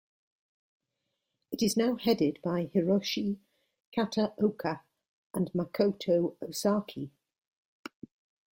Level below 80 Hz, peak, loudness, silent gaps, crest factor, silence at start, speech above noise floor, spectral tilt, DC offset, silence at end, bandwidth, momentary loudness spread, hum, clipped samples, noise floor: -70 dBFS; -14 dBFS; -30 LUFS; 3.85-3.92 s, 5.08-5.30 s; 18 dB; 1.5 s; 54 dB; -5.5 dB/octave; under 0.1%; 1.45 s; 16.5 kHz; 15 LU; none; under 0.1%; -84 dBFS